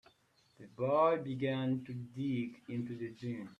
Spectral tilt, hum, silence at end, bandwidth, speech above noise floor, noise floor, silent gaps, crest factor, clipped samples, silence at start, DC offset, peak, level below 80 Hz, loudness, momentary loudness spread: -8.5 dB/octave; none; 0.05 s; 9 kHz; 35 dB; -71 dBFS; none; 18 dB; under 0.1%; 0.6 s; under 0.1%; -18 dBFS; -76 dBFS; -36 LUFS; 13 LU